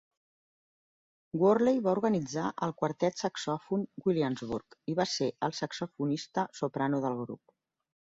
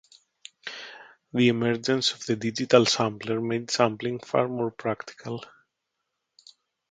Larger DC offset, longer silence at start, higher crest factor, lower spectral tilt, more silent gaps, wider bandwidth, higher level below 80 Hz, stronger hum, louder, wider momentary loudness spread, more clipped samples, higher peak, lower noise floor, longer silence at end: neither; first, 1.35 s vs 0.65 s; second, 18 dB vs 26 dB; about the same, -5.5 dB/octave vs -4.5 dB/octave; neither; second, 7.8 kHz vs 9.4 kHz; about the same, -70 dBFS vs -68 dBFS; neither; second, -31 LUFS vs -25 LUFS; second, 10 LU vs 17 LU; neither; second, -14 dBFS vs -2 dBFS; first, under -90 dBFS vs -81 dBFS; second, 0.85 s vs 1.45 s